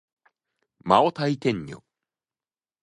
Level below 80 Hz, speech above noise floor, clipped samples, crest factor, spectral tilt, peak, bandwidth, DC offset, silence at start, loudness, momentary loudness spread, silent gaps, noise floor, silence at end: -62 dBFS; over 67 dB; under 0.1%; 26 dB; -6.5 dB/octave; -2 dBFS; 11 kHz; under 0.1%; 0.85 s; -23 LUFS; 19 LU; none; under -90 dBFS; 1.1 s